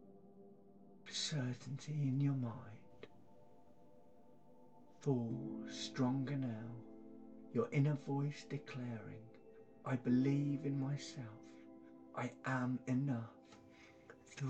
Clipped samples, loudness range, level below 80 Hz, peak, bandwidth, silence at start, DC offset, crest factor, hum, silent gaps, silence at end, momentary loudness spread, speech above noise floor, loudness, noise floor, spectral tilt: under 0.1%; 5 LU; -78 dBFS; -24 dBFS; 8.8 kHz; 0 s; under 0.1%; 18 dB; none; none; 0 s; 24 LU; 26 dB; -41 LUFS; -66 dBFS; -6.5 dB/octave